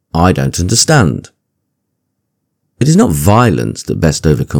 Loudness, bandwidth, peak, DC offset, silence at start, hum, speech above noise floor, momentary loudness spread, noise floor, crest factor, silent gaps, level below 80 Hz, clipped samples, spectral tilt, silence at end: -11 LUFS; over 20 kHz; 0 dBFS; under 0.1%; 0.15 s; none; 59 dB; 8 LU; -69 dBFS; 12 dB; none; -30 dBFS; 0.7%; -5 dB/octave; 0 s